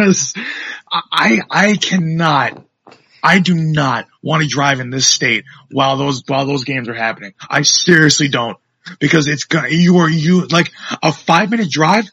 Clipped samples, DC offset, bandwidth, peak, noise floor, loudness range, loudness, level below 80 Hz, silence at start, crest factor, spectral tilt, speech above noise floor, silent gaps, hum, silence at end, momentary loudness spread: 0.1%; under 0.1%; 9 kHz; 0 dBFS; -47 dBFS; 3 LU; -14 LUFS; -56 dBFS; 0 s; 14 dB; -4 dB/octave; 33 dB; none; none; 0.05 s; 10 LU